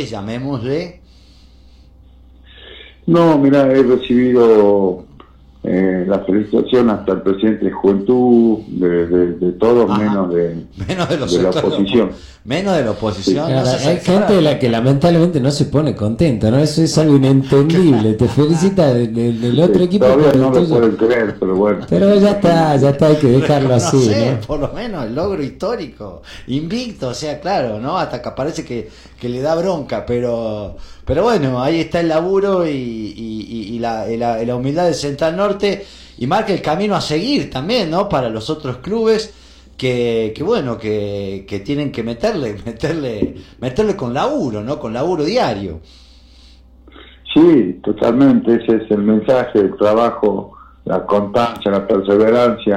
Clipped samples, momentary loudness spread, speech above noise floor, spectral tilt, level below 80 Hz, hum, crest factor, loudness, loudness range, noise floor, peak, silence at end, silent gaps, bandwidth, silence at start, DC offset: under 0.1%; 12 LU; 29 dB; -7 dB/octave; -42 dBFS; none; 14 dB; -15 LUFS; 8 LU; -44 dBFS; 0 dBFS; 0 s; none; 12.5 kHz; 0 s; under 0.1%